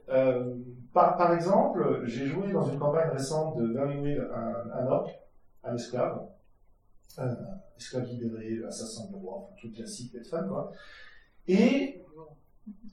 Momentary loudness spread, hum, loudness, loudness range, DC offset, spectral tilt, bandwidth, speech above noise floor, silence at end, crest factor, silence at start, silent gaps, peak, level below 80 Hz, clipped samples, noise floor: 18 LU; none; -30 LUFS; 11 LU; under 0.1%; -6.5 dB/octave; 13.5 kHz; 31 dB; 0 s; 22 dB; 0.05 s; none; -10 dBFS; -58 dBFS; under 0.1%; -60 dBFS